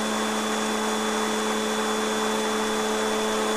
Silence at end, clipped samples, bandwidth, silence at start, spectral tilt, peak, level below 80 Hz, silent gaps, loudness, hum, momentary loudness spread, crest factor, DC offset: 0 s; under 0.1%; 15.5 kHz; 0 s; -2.5 dB/octave; -14 dBFS; -56 dBFS; none; -25 LUFS; none; 1 LU; 12 dB; 0.2%